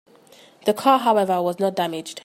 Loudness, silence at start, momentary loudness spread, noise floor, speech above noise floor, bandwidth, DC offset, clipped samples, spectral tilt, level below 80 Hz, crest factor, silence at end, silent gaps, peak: -21 LUFS; 0.65 s; 9 LU; -50 dBFS; 30 dB; 16 kHz; under 0.1%; under 0.1%; -5 dB/octave; -74 dBFS; 18 dB; 0.05 s; none; -4 dBFS